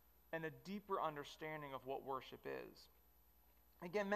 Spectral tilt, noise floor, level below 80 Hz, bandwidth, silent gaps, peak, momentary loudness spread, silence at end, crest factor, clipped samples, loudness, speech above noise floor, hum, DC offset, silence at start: -5.5 dB/octave; -73 dBFS; -76 dBFS; 15.5 kHz; none; -28 dBFS; 12 LU; 0 s; 20 dB; under 0.1%; -48 LUFS; 26 dB; 50 Hz at -80 dBFS; under 0.1%; 0.3 s